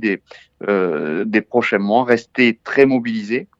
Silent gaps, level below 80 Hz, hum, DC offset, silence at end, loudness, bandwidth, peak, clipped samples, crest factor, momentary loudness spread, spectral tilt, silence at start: none; -66 dBFS; none; under 0.1%; 0.15 s; -17 LUFS; 7.8 kHz; 0 dBFS; under 0.1%; 18 dB; 7 LU; -6.5 dB/octave; 0 s